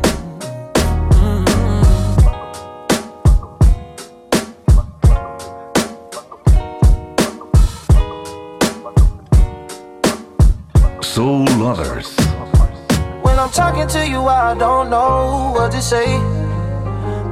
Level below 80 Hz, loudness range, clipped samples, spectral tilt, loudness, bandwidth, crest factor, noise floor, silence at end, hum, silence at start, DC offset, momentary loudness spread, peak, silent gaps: -18 dBFS; 2 LU; under 0.1%; -6 dB/octave; -16 LUFS; 15.5 kHz; 12 dB; -35 dBFS; 0 s; none; 0 s; under 0.1%; 11 LU; -2 dBFS; none